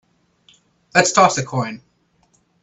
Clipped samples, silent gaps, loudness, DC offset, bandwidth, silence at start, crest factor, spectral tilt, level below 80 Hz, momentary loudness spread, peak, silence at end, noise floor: under 0.1%; none; -17 LUFS; under 0.1%; 10.5 kHz; 0.95 s; 20 dB; -3.5 dB/octave; -60 dBFS; 15 LU; 0 dBFS; 0.85 s; -61 dBFS